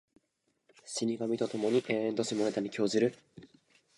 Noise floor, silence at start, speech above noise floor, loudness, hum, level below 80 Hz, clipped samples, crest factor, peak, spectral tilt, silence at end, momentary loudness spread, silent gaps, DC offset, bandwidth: -79 dBFS; 0.85 s; 47 dB; -32 LUFS; none; -78 dBFS; under 0.1%; 18 dB; -14 dBFS; -4.5 dB/octave; 0.5 s; 4 LU; none; under 0.1%; 11.5 kHz